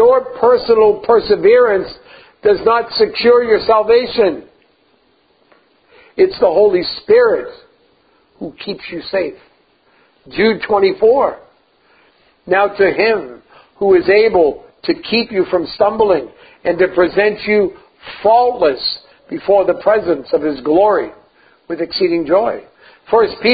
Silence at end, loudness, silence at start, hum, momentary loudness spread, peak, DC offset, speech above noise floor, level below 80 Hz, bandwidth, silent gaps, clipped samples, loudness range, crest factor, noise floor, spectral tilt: 0 s; -14 LUFS; 0 s; none; 14 LU; 0 dBFS; under 0.1%; 43 dB; -50 dBFS; 5 kHz; none; under 0.1%; 4 LU; 14 dB; -56 dBFS; -8.5 dB/octave